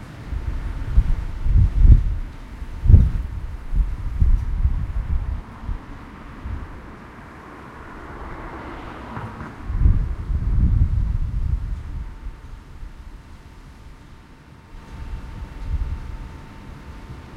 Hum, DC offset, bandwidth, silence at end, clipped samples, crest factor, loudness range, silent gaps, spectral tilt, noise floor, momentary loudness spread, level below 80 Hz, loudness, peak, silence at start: none; under 0.1%; 5.4 kHz; 0 s; under 0.1%; 22 dB; 16 LU; none; -8.5 dB/octave; -45 dBFS; 23 LU; -22 dBFS; -24 LUFS; 0 dBFS; 0 s